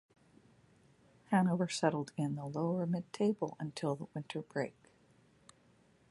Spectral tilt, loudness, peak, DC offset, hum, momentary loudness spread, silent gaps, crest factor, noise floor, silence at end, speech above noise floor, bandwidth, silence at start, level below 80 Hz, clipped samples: -6.5 dB/octave; -36 LUFS; -16 dBFS; under 0.1%; none; 9 LU; none; 22 dB; -68 dBFS; 1.4 s; 33 dB; 11.5 kHz; 1.3 s; -78 dBFS; under 0.1%